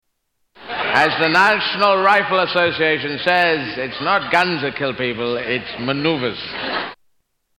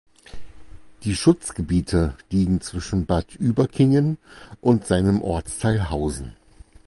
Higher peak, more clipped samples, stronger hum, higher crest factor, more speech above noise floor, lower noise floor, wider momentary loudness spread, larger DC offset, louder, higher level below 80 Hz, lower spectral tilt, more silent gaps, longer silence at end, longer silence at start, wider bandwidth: first, -2 dBFS vs -6 dBFS; neither; neither; about the same, 16 dB vs 16 dB; first, 53 dB vs 23 dB; first, -71 dBFS vs -44 dBFS; about the same, 10 LU vs 8 LU; neither; first, -17 LUFS vs -22 LUFS; second, -56 dBFS vs -36 dBFS; second, -5 dB/octave vs -6.5 dB/octave; neither; about the same, 0.65 s vs 0.55 s; first, 0.6 s vs 0.35 s; first, 16.5 kHz vs 11.5 kHz